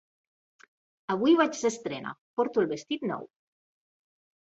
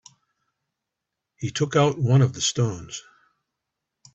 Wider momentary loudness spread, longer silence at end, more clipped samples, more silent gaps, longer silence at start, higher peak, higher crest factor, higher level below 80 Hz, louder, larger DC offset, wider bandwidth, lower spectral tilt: about the same, 14 LU vs 16 LU; about the same, 1.25 s vs 1.15 s; neither; first, 2.18-2.37 s vs none; second, 1.1 s vs 1.4 s; second, -10 dBFS vs -6 dBFS; about the same, 20 dB vs 18 dB; second, -74 dBFS vs -58 dBFS; second, -28 LUFS vs -22 LUFS; neither; about the same, 8.2 kHz vs 8 kHz; about the same, -4.5 dB/octave vs -5 dB/octave